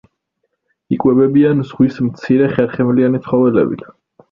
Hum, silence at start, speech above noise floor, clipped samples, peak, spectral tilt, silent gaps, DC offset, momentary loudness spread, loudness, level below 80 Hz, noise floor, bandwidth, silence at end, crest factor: none; 0.9 s; 57 dB; under 0.1%; 0 dBFS; -10 dB/octave; none; under 0.1%; 8 LU; -14 LUFS; -50 dBFS; -71 dBFS; 5.8 kHz; 0.5 s; 14 dB